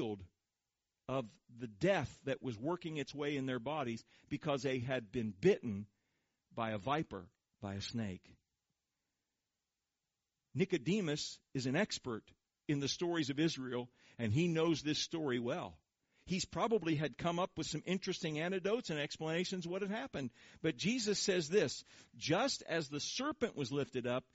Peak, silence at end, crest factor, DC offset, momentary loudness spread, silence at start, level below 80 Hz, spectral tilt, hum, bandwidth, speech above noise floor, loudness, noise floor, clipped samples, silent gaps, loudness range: -20 dBFS; 0.15 s; 20 dB; under 0.1%; 12 LU; 0 s; -70 dBFS; -4.5 dB/octave; none; 8 kHz; over 52 dB; -38 LUFS; under -90 dBFS; under 0.1%; none; 7 LU